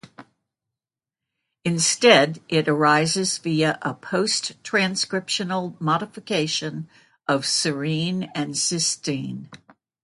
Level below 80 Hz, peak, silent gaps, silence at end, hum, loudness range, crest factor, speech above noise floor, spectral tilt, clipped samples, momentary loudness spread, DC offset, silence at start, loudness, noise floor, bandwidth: -68 dBFS; 0 dBFS; none; 0.45 s; none; 5 LU; 22 dB; 67 dB; -3.5 dB/octave; under 0.1%; 12 LU; under 0.1%; 0.05 s; -22 LUFS; -89 dBFS; 11.5 kHz